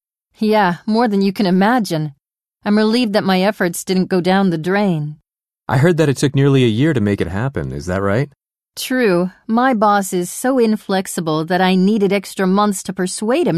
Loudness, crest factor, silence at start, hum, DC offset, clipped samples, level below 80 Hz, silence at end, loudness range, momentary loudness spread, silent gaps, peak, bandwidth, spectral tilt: -16 LUFS; 16 dB; 0.4 s; none; under 0.1%; under 0.1%; -48 dBFS; 0 s; 2 LU; 8 LU; none; 0 dBFS; 13.5 kHz; -6 dB/octave